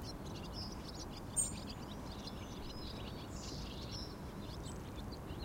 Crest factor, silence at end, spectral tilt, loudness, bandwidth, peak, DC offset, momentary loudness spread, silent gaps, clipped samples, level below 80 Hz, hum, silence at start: 22 dB; 0 s; -3.5 dB/octave; -44 LUFS; 16 kHz; -24 dBFS; under 0.1%; 9 LU; none; under 0.1%; -52 dBFS; none; 0 s